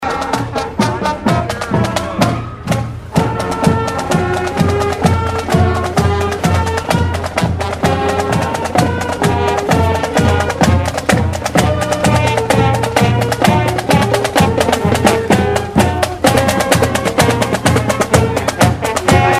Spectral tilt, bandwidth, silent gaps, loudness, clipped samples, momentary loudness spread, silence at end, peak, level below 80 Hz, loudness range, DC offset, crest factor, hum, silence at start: -5.5 dB/octave; 16 kHz; none; -14 LUFS; under 0.1%; 4 LU; 0 s; 0 dBFS; -30 dBFS; 3 LU; under 0.1%; 14 dB; none; 0 s